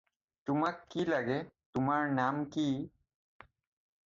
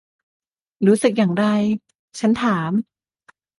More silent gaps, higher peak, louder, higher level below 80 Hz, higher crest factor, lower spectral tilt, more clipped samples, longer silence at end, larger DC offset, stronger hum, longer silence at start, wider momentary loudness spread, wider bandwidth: second, 1.66-1.73 s vs 1.95-2.08 s; second, -16 dBFS vs -2 dBFS; second, -34 LUFS vs -19 LUFS; second, -68 dBFS vs -60 dBFS; about the same, 18 dB vs 18 dB; about the same, -7 dB/octave vs -6.5 dB/octave; neither; first, 1.15 s vs 0.75 s; neither; neither; second, 0.45 s vs 0.8 s; about the same, 8 LU vs 10 LU; second, 7.6 kHz vs 11.5 kHz